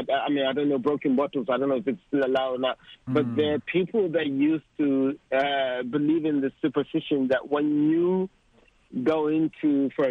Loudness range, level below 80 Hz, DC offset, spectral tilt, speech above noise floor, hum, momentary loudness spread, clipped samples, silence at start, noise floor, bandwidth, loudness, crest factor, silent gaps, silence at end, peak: 1 LU; -66 dBFS; under 0.1%; -8 dB/octave; 36 dB; none; 4 LU; under 0.1%; 0 s; -60 dBFS; 4.9 kHz; -25 LUFS; 16 dB; none; 0 s; -10 dBFS